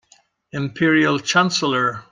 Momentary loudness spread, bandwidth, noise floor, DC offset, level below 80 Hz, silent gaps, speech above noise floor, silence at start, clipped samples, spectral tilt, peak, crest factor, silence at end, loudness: 11 LU; 9.8 kHz; -57 dBFS; under 0.1%; -60 dBFS; none; 38 dB; 0.55 s; under 0.1%; -4 dB/octave; -2 dBFS; 18 dB; 0.1 s; -18 LUFS